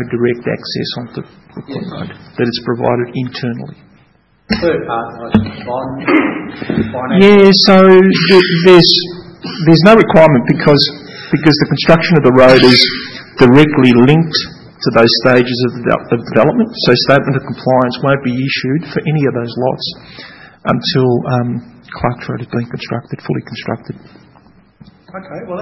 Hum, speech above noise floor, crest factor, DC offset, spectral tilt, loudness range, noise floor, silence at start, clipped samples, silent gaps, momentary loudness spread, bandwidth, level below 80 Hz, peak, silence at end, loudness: none; 40 dB; 12 dB; under 0.1%; -6.5 dB/octave; 12 LU; -51 dBFS; 0 s; 0.9%; none; 19 LU; 12 kHz; -42 dBFS; 0 dBFS; 0 s; -11 LUFS